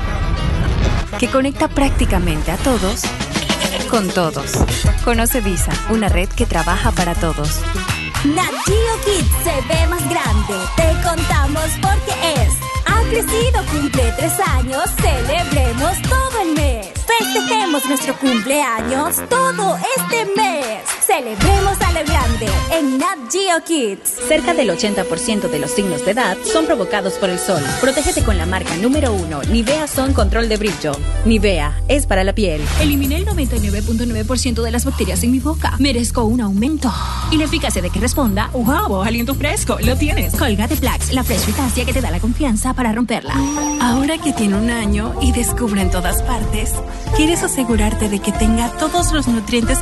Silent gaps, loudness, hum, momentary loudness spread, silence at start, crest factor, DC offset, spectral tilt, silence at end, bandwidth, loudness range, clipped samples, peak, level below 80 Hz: none; -17 LUFS; none; 3 LU; 0 s; 14 dB; under 0.1%; -4.5 dB/octave; 0 s; 12.5 kHz; 1 LU; under 0.1%; -2 dBFS; -22 dBFS